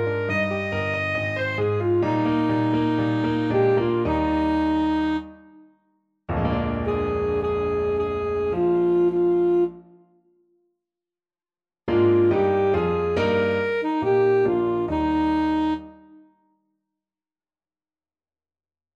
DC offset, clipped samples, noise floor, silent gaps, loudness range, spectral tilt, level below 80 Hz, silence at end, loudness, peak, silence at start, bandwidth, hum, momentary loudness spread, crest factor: under 0.1%; under 0.1%; under -90 dBFS; none; 5 LU; -8.5 dB/octave; -44 dBFS; 3 s; -22 LUFS; -10 dBFS; 0 s; 7.2 kHz; none; 5 LU; 14 dB